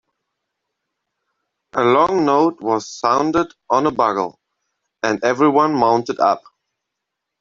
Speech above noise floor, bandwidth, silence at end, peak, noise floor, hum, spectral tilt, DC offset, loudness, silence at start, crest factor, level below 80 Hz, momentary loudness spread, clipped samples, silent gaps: 63 dB; 7.6 kHz; 1 s; 0 dBFS; -80 dBFS; none; -5.5 dB/octave; under 0.1%; -17 LUFS; 1.75 s; 18 dB; -58 dBFS; 8 LU; under 0.1%; none